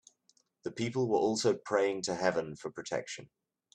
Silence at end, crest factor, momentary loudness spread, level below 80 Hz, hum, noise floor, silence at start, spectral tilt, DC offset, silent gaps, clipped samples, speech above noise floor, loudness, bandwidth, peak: 0.5 s; 20 dB; 14 LU; -72 dBFS; none; -72 dBFS; 0.65 s; -4.5 dB/octave; under 0.1%; none; under 0.1%; 40 dB; -32 LUFS; 10.5 kHz; -14 dBFS